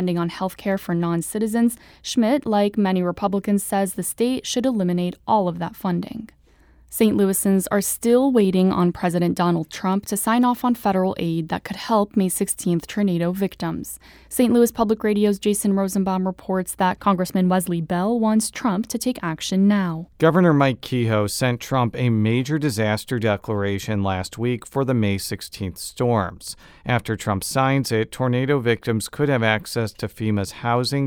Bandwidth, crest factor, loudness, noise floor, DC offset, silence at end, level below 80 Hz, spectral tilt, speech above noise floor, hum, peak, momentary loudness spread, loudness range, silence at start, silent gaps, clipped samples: over 20 kHz; 18 dB; -21 LUFS; -53 dBFS; under 0.1%; 0 s; -52 dBFS; -5.5 dB/octave; 32 dB; none; -2 dBFS; 8 LU; 4 LU; 0 s; none; under 0.1%